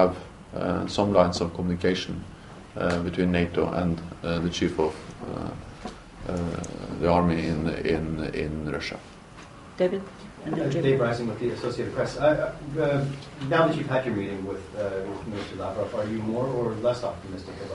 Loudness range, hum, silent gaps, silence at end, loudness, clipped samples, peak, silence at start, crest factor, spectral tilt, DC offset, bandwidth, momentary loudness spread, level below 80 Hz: 4 LU; none; none; 0 s; -27 LUFS; under 0.1%; -4 dBFS; 0 s; 22 dB; -6.5 dB/octave; under 0.1%; 11.5 kHz; 15 LU; -48 dBFS